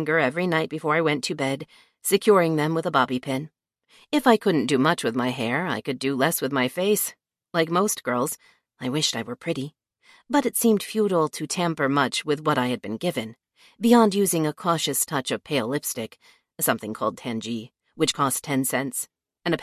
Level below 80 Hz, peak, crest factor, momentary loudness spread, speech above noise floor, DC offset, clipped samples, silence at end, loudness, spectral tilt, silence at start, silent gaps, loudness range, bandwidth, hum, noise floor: -68 dBFS; -2 dBFS; 22 dB; 11 LU; 34 dB; under 0.1%; under 0.1%; 0 s; -24 LUFS; -4 dB/octave; 0 s; none; 4 LU; 14.5 kHz; none; -58 dBFS